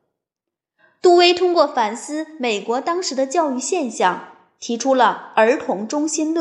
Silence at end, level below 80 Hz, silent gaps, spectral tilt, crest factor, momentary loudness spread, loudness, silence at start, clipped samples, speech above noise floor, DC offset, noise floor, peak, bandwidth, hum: 0 s; -72 dBFS; none; -2.5 dB/octave; 18 dB; 10 LU; -18 LUFS; 1.05 s; under 0.1%; 67 dB; under 0.1%; -85 dBFS; -2 dBFS; 11 kHz; none